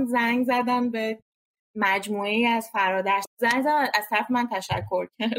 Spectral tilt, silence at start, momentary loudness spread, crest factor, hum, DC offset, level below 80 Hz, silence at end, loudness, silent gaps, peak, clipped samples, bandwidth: -4.5 dB/octave; 0 s; 7 LU; 18 dB; none; under 0.1%; -64 dBFS; 0 s; -24 LUFS; 1.22-1.74 s, 3.27-3.37 s; -6 dBFS; under 0.1%; 16 kHz